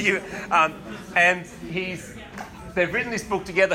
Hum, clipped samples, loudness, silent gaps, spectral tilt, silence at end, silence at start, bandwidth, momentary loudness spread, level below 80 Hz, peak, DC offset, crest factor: none; under 0.1%; -23 LUFS; none; -4 dB/octave; 0 s; 0 s; 16 kHz; 19 LU; -52 dBFS; -6 dBFS; under 0.1%; 18 dB